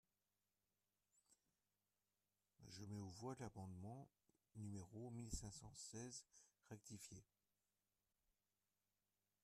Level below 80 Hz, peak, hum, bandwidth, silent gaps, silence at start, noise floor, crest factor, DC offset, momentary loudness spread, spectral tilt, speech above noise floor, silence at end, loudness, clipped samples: -72 dBFS; -36 dBFS; 50 Hz at -75 dBFS; 13.5 kHz; none; 1.15 s; under -90 dBFS; 24 dB; under 0.1%; 9 LU; -5 dB/octave; over 34 dB; 2.2 s; -57 LUFS; under 0.1%